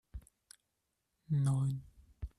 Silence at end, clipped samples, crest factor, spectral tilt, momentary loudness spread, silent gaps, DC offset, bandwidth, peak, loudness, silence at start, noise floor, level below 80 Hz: 0.1 s; under 0.1%; 14 dB; -8 dB/octave; 22 LU; none; under 0.1%; 11.5 kHz; -24 dBFS; -35 LUFS; 0.15 s; -84 dBFS; -56 dBFS